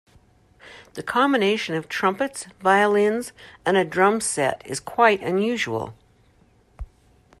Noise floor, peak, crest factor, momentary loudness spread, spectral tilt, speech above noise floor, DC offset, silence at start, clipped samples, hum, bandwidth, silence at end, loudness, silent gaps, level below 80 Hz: -58 dBFS; -4 dBFS; 20 dB; 17 LU; -4 dB/octave; 36 dB; under 0.1%; 0.65 s; under 0.1%; none; 13.5 kHz; 0.55 s; -22 LUFS; none; -50 dBFS